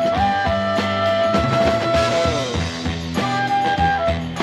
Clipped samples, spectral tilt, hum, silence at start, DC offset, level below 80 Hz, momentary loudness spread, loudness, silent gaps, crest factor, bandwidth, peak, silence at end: under 0.1%; -5.5 dB/octave; none; 0 s; under 0.1%; -36 dBFS; 6 LU; -19 LUFS; none; 14 dB; 13 kHz; -4 dBFS; 0 s